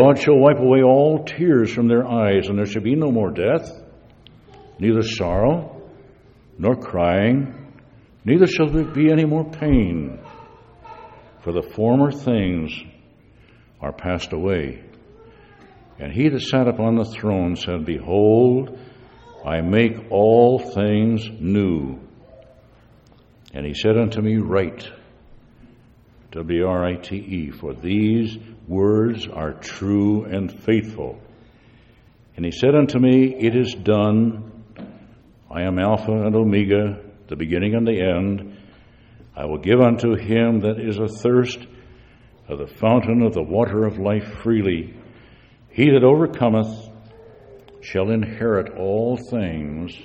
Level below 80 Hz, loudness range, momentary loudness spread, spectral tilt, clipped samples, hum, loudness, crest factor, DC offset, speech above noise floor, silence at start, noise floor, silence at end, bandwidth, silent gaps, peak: -42 dBFS; 5 LU; 17 LU; -8 dB/octave; under 0.1%; none; -19 LUFS; 20 dB; under 0.1%; 33 dB; 0 s; -51 dBFS; 0 s; 8 kHz; none; 0 dBFS